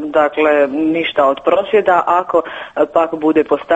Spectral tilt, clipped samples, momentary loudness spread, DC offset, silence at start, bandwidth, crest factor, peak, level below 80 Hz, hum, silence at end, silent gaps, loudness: -6 dB/octave; under 0.1%; 5 LU; under 0.1%; 0 s; 8 kHz; 14 dB; 0 dBFS; -54 dBFS; none; 0 s; none; -14 LUFS